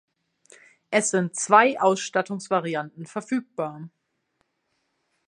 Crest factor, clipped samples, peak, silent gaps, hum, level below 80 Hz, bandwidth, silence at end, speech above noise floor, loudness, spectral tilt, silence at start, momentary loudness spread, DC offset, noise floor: 24 dB; under 0.1%; -2 dBFS; none; none; -80 dBFS; 11 kHz; 1.4 s; 51 dB; -23 LUFS; -4 dB/octave; 0.9 s; 15 LU; under 0.1%; -74 dBFS